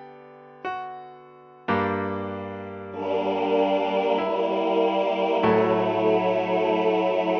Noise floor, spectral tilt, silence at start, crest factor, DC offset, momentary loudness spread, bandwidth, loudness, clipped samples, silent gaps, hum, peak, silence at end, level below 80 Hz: -48 dBFS; -7.5 dB/octave; 0 s; 16 dB; under 0.1%; 14 LU; 6.4 kHz; -24 LUFS; under 0.1%; none; none; -10 dBFS; 0 s; -66 dBFS